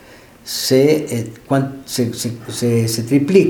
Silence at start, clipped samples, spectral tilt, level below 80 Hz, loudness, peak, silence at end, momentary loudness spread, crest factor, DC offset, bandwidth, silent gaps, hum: 0.1 s; under 0.1%; -5.5 dB/octave; -54 dBFS; -18 LUFS; 0 dBFS; 0 s; 11 LU; 16 dB; under 0.1%; 18.5 kHz; none; none